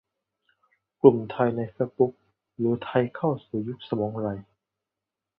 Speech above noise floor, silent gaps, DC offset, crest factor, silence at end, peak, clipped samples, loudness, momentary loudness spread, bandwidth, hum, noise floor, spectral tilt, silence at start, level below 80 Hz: 63 dB; none; under 0.1%; 24 dB; 0.95 s; -2 dBFS; under 0.1%; -26 LUFS; 13 LU; 4.5 kHz; none; -87 dBFS; -11.5 dB/octave; 1.05 s; -62 dBFS